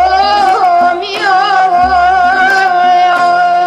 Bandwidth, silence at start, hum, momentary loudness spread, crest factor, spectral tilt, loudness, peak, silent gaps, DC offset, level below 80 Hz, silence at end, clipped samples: 11 kHz; 0 s; none; 2 LU; 8 dB; -3 dB/octave; -9 LUFS; 0 dBFS; none; under 0.1%; -38 dBFS; 0 s; under 0.1%